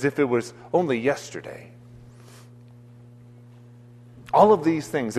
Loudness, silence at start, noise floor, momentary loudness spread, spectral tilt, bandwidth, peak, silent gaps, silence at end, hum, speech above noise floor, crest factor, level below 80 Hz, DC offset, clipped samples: -22 LUFS; 0 s; -47 dBFS; 20 LU; -6 dB/octave; 13.5 kHz; -4 dBFS; none; 0 s; none; 25 dB; 22 dB; -62 dBFS; under 0.1%; under 0.1%